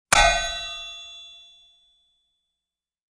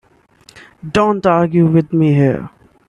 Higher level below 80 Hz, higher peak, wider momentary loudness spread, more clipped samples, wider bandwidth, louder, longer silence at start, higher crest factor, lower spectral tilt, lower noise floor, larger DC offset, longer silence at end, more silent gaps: first, -38 dBFS vs -48 dBFS; about the same, -2 dBFS vs 0 dBFS; first, 24 LU vs 13 LU; neither; first, 11 kHz vs 9.4 kHz; second, -22 LUFS vs -14 LUFS; second, 0.1 s vs 0.85 s; first, 26 dB vs 14 dB; second, -0.5 dB/octave vs -8.5 dB/octave; first, -88 dBFS vs -48 dBFS; neither; first, 1.8 s vs 0.4 s; neither